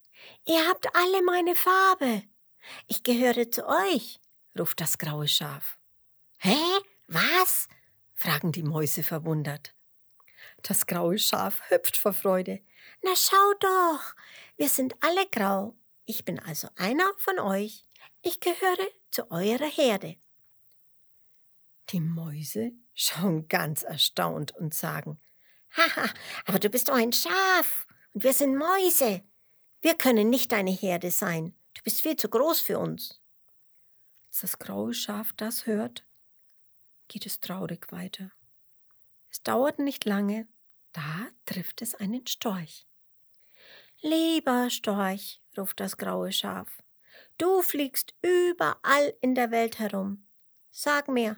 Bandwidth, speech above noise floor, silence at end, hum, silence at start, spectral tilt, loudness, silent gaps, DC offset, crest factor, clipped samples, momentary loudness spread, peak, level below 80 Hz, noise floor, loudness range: over 20 kHz; 36 dB; 0 s; none; 0.2 s; -3.5 dB/octave; -26 LUFS; none; under 0.1%; 26 dB; under 0.1%; 15 LU; -2 dBFS; -80 dBFS; -62 dBFS; 9 LU